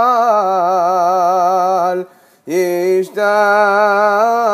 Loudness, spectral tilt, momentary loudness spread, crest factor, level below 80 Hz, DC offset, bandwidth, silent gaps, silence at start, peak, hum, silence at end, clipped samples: -13 LUFS; -4.5 dB/octave; 7 LU; 12 dB; -82 dBFS; under 0.1%; 15.5 kHz; none; 0 s; 0 dBFS; none; 0 s; under 0.1%